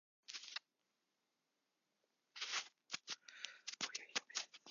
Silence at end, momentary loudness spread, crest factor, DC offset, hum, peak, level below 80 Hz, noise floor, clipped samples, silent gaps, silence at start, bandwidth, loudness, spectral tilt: 0 s; 9 LU; 28 dB; under 0.1%; none; -24 dBFS; under -90 dBFS; -88 dBFS; under 0.1%; none; 0.3 s; 7.2 kHz; -47 LUFS; 3 dB/octave